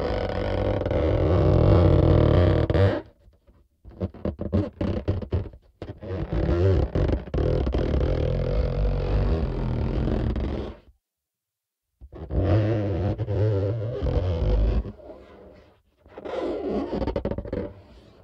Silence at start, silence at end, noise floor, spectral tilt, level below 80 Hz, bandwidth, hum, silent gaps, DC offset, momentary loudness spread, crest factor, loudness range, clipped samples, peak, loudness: 0 s; 0.25 s; -86 dBFS; -9.5 dB/octave; -30 dBFS; 6 kHz; none; none; under 0.1%; 15 LU; 18 dB; 9 LU; under 0.1%; -8 dBFS; -25 LUFS